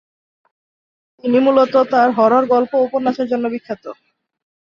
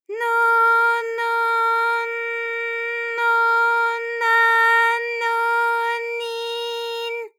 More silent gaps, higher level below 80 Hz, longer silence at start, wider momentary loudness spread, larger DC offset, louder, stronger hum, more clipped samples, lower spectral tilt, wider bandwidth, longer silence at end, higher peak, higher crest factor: neither; first, -64 dBFS vs under -90 dBFS; first, 1.25 s vs 0.1 s; first, 14 LU vs 11 LU; neither; first, -15 LUFS vs -19 LUFS; neither; neither; first, -7 dB/octave vs 3 dB/octave; second, 6.8 kHz vs 16.5 kHz; first, 0.75 s vs 0.1 s; first, -2 dBFS vs -8 dBFS; about the same, 16 dB vs 12 dB